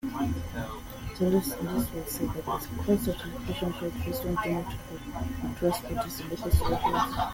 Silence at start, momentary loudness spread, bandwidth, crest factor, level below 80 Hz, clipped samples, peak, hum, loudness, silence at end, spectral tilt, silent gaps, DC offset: 0.05 s; 10 LU; 17 kHz; 20 dB; -40 dBFS; under 0.1%; -10 dBFS; none; -31 LUFS; 0 s; -6 dB/octave; none; under 0.1%